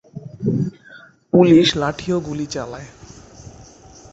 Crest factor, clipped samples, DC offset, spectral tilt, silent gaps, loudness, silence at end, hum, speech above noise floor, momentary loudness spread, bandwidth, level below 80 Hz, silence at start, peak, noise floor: 18 dB; under 0.1%; under 0.1%; -6 dB/octave; none; -18 LUFS; 0.5 s; none; 28 dB; 22 LU; 8 kHz; -48 dBFS; 0.15 s; -2 dBFS; -45 dBFS